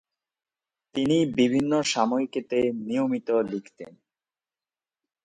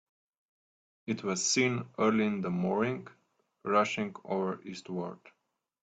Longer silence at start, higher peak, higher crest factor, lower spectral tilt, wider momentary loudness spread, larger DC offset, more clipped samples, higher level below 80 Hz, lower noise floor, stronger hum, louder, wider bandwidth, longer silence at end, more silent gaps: about the same, 0.95 s vs 1.05 s; first, -6 dBFS vs -12 dBFS; about the same, 20 dB vs 20 dB; about the same, -5 dB/octave vs -4 dB/octave; about the same, 13 LU vs 14 LU; neither; neither; first, -64 dBFS vs -74 dBFS; about the same, under -90 dBFS vs under -90 dBFS; neither; first, -25 LUFS vs -31 LUFS; about the same, 9.6 kHz vs 9.2 kHz; first, 1.35 s vs 0.7 s; neither